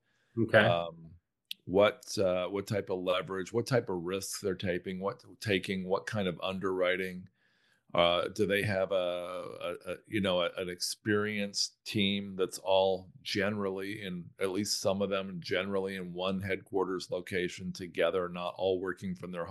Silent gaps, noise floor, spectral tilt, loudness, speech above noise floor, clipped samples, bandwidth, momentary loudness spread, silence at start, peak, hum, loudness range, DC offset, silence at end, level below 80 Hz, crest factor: none; -71 dBFS; -4.5 dB/octave; -32 LUFS; 39 dB; under 0.1%; 12.5 kHz; 11 LU; 0.35 s; -8 dBFS; none; 3 LU; under 0.1%; 0 s; -70 dBFS; 24 dB